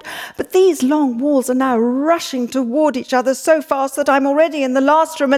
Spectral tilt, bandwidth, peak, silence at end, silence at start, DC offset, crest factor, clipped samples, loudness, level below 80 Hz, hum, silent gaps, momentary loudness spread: -3.5 dB/octave; 15.5 kHz; -2 dBFS; 0 s; 0.05 s; under 0.1%; 12 dB; under 0.1%; -16 LUFS; -62 dBFS; none; none; 5 LU